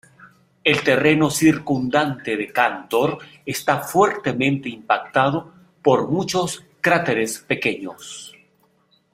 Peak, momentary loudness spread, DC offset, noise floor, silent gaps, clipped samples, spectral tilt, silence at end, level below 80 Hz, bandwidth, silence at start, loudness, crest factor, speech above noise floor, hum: -2 dBFS; 11 LU; under 0.1%; -61 dBFS; none; under 0.1%; -4.5 dB/octave; 0.85 s; -60 dBFS; 16 kHz; 0.2 s; -20 LUFS; 20 dB; 41 dB; none